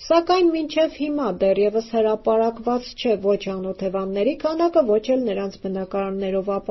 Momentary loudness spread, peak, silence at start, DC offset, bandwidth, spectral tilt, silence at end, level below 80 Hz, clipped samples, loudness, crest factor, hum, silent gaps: 7 LU; -4 dBFS; 0 s; under 0.1%; 6.2 kHz; -4.5 dB/octave; 0.1 s; -50 dBFS; under 0.1%; -22 LUFS; 16 dB; none; none